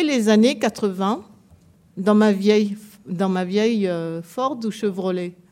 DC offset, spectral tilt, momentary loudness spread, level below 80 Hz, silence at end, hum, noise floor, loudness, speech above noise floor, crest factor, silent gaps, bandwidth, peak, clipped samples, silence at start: under 0.1%; -6 dB/octave; 12 LU; -66 dBFS; 0.2 s; none; -52 dBFS; -21 LUFS; 33 dB; 16 dB; none; 14.5 kHz; -4 dBFS; under 0.1%; 0 s